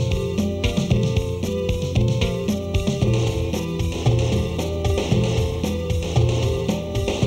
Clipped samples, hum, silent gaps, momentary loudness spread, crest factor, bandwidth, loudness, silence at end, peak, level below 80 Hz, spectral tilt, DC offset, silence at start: under 0.1%; none; none; 4 LU; 14 dB; 14 kHz; -22 LUFS; 0 s; -6 dBFS; -30 dBFS; -6.5 dB/octave; under 0.1%; 0 s